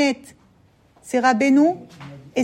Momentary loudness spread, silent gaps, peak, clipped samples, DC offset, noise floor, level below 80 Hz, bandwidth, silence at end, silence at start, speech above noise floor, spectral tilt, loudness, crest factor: 21 LU; none; -4 dBFS; under 0.1%; under 0.1%; -56 dBFS; -64 dBFS; 12 kHz; 0 s; 0 s; 37 dB; -4.5 dB/octave; -19 LUFS; 16 dB